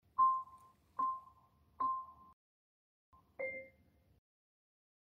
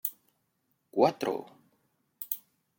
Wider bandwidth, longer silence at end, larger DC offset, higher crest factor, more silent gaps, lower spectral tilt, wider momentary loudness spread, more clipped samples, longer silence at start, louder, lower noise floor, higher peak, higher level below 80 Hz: second, 4.3 kHz vs 17 kHz; first, 1.4 s vs 0.4 s; neither; second, 20 dB vs 26 dB; first, 2.33-3.12 s vs none; about the same, -6 dB/octave vs -5 dB/octave; first, 21 LU vs 12 LU; neither; first, 0.2 s vs 0.05 s; second, -39 LUFS vs -31 LUFS; second, -70 dBFS vs -77 dBFS; second, -22 dBFS vs -8 dBFS; about the same, -78 dBFS vs -82 dBFS